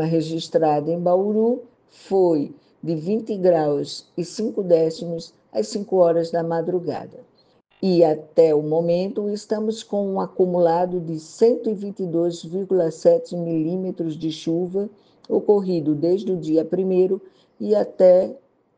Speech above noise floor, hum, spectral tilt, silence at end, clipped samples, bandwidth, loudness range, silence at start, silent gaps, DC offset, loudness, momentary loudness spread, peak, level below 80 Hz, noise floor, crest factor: 38 dB; none; -7.5 dB/octave; 0.4 s; under 0.1%; 9.4 kHz; 3 LU; 0 s; none; under 0.1%; -21 LUFS; 11 LU; -4 dBFS; -68 dBFS; -59 dBFS; 18 dB